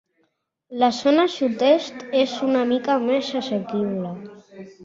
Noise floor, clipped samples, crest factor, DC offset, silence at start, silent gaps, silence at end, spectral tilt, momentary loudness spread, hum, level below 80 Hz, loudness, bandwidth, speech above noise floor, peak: -70 dBFS; under 0.1%; 18 dB; under 0.1%; 0.7 s; none; 0 s; -5.5 dB/octave; 14 LU; none; -68 dBFS; -21 LUFS; 7.8 kHz; 49 dB; -4 dBFS